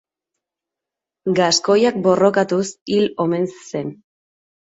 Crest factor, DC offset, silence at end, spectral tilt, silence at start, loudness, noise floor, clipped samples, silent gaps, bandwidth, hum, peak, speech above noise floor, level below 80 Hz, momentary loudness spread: 18 dB; under 0.1%; 0.85 s; -4.5 dB/octave; 1.25 s; -18 LUFS; -86 dBFS; under 0.1%; 2.81-2.86 s; 8 kHz; none; -2 dBFS; 68 dB; -64 dBFS; 13 LU